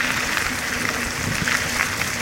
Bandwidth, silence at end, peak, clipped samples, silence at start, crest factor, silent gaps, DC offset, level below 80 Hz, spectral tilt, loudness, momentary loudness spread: 17 kHz; 0 s; -2 dBFS; under 0.1%; 0 s; 22 dB; none; 0.1%; -42 dBFS; -2 dB/octave; -21 LUFS; 3 LU